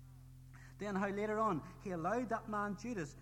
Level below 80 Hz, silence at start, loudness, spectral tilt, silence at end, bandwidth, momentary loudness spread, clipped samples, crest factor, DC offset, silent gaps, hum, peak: -62 dBFS; 0 s; -40 LUFS; -6.5 dB/octave; 0 s; 16.5 kHz; 21 LU; under 0.1%; 16 dB; under 0.1%; none; none; -24 dBFS